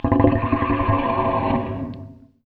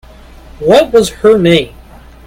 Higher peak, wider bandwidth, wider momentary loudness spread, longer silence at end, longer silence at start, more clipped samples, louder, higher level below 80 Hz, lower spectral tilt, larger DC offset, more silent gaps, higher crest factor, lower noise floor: about the same, 0 dBFS vs 0 dBFS; second, 4.6 kHz vs 16 kHz; first, 13 LU vs 9 LU; second, 0.3 s vs 0.6 s; second, 0.05 s vs 0.6 s; second, under 0.1% vs 0.2%; second, -21 LUFS vs -9 LUFS; about the same, -34 dBFS vs -36 dBFS; first, -10.5 dB/octave vs -5.5 dB/octave; neither; neither; first, 20 dB vs 12 dB; first, -40 dBFS vs -35 dBFS